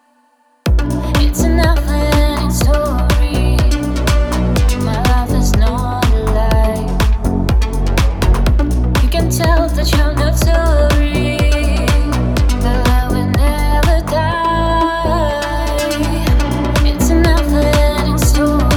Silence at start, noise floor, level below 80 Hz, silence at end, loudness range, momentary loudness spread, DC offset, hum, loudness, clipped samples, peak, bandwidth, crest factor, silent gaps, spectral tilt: 0.65 s; -55 dBFS; -14 dBFS; 0 s; 1 LU; 3 LU; under 0.1%; none; -14 LUFS; under 0.1%; 0 dBFS; 17.5 kHz; 12 dB; none; -5.5 dB/octave